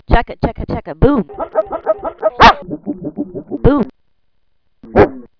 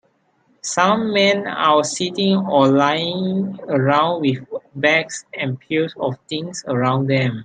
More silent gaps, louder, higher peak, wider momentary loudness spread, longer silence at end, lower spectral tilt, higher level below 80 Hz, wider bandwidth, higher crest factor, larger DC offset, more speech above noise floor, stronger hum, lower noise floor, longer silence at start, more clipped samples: neither; first, -15 LUFS vs -18 LUFS; about the same, 0 dBFS vs -2 dBFS; first, 16 LU vs 10 LU; first, 0.15 s vs 0 s; first, -7 dB/octave vs -5 dB/octave; first, -24 dBFS vs -64 dBFS; second, 5.4 kHz vs 9.4 kHz; about the same, 14 dB vs 18 dB; neither; first, 51 dB vs 43 dB; neither; first, -66 dBFS vs -61 dBFS; second, 0.1 s vs 0.65 s; first, 0.8% vs under 0.1%